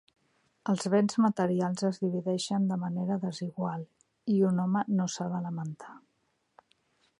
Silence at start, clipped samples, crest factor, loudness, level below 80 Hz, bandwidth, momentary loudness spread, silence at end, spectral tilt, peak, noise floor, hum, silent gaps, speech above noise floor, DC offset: 0.65 s; under 0.1%; 18 dB; -30 LUFS; -76 dBFS; 11 kHz; 13 LU; 1.2 s; -6.5 dB/octave; -14 dBFS; -75 dBFS; none; none; 46 dB; under 0.1%